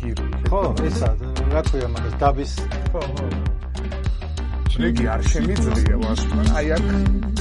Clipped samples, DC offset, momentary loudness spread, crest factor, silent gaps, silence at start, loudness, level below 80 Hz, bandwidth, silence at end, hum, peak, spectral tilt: under 0.1%; under 0.1%; 7 LU; 16 dB; none; 0 s; -22 LUFS; -22 dBFS; 11 kHz; 0 s; none; -4 dBFS; -6.5 dB/octave